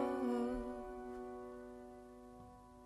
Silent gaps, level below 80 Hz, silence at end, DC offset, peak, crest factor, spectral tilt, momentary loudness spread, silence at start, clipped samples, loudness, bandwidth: none; -60 dBFS; 0 s; under 0.1%; -26 dBFS; 18 dB; -6.5 dB/octave; 19 LU; 0 s; under 0.1%; -44 LUFS; 12 kHz